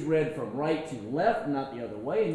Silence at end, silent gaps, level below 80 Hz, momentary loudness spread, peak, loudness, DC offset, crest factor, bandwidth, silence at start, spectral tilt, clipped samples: 0 s; none; -62 dBFS; 7 LU; -12 dBFS; -30 LUFS; under 0.1%; 16 dB; 11 kHz; 0 s; -7 dB/octave; under 0.1%